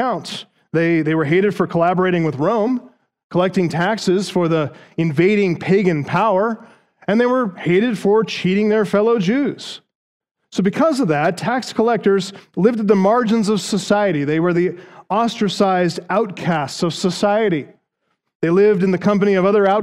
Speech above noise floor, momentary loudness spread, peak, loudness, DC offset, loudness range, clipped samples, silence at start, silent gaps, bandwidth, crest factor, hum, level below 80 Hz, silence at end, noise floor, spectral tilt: 55 dB; 8 LU; -2 dBFS; -17 LUFS; under 0.1%; 2 LU; under 0.1%; 0 s; 3.24-3.30 s, 9.95-10.20 s, 10.31-10.35 s, 18.35-18.40 s; 13 kHz; 16 dB; none; -62 dBFS; 0 s; -71 dBFS; -6.5 dB/octave